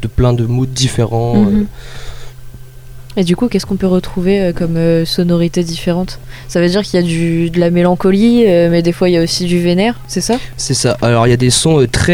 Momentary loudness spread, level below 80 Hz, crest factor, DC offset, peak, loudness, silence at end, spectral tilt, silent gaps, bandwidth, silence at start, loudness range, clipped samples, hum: 8 LU; -30 dBFS; 12 dB; under 0.1%; 0 dBFS; -13 LUFS; 0 s; -5.5 dB/octave; none; 16 kHz; 0 s; 4 LU; under 0.1%; none